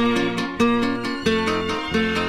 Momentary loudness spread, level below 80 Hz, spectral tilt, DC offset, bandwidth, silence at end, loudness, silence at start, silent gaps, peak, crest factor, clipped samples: 4 LU; -46 dBFS; -5 dB/octave; under 0.1%; 14 kHz; 0 s; -22 LUFS; 0 s; none; -6 dBFS; 14 dB; under 0.1%